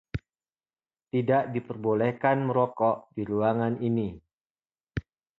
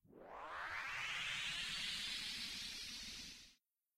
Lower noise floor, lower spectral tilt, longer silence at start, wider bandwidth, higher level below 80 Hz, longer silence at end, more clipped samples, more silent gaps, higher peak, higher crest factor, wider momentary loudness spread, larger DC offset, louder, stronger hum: first, under -90 dBFS vs -74 dBFS; first, -10 dB/octave vs 0 dB/octave; about the same, 0.15 s vs 0.1 s; second, 6 kHz vs 16 kHz; first, -54 dBFS vs -68 dBFS; about the same, 0.4 s vs 0.45 s; neither; first, 4.33-4.41 s, 4.50-4.55 s vs none; first, -10 dBFS vs -32 dBFS; about the same, 18 dB vs 16 dB; about the same, 13 LU vs 13 LU; neither; first, -27 LUFS vs -44 LUFS; neither